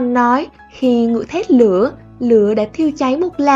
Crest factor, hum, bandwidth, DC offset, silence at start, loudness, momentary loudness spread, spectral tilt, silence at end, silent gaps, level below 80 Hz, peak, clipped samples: 14 dB; none; 7.6 kHz; under 0.1%; 0 s; -15 LUFS; 7 LU; -6.5 dB/octave; 0 s; none; -48 dBFS; 0 dBFS; under 0.1%